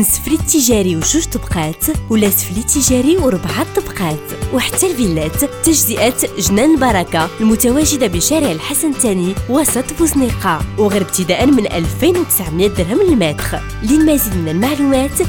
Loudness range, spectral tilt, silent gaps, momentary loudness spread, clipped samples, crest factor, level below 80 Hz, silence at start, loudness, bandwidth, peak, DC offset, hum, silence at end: 2 LU; -4 dB/octave; none; 6 LU; under 0.1%; 12 dB; -28 dBFS; 0 s; -14 LUFS; 19.5 kHz; -2 dBFS; under 0.1%; none; 0 s